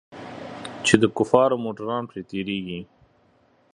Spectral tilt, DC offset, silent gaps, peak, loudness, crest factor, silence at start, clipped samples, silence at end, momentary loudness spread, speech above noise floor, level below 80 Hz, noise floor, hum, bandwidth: -5 dB/octave; under 0.1%; none; 0 dBFS; -22 LUFS; 24 dB; 0.1 s; under 0.1%; 0.9 s; 18 LU; 39 dB; -58 dBFS; -61 dBFS; none; 11.5 kHz